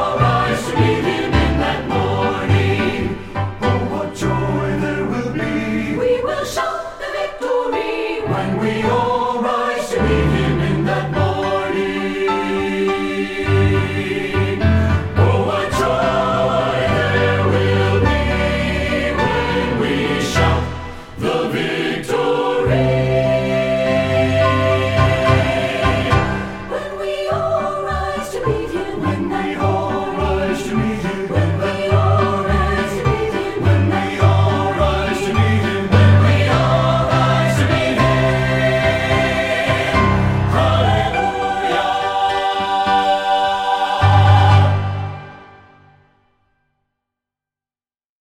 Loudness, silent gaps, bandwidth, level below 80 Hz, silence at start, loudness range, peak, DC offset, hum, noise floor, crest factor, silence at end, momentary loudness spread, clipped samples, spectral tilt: -17 LUFS; none; 12.5 kHz; -32 dBFS; 0 s; 5 LU; 0 dBFS; under 0.1%; none; under -90 dBFS; 16 dB; 2.75 s; 6 LU; under 0.1%; -6.5 dB/octave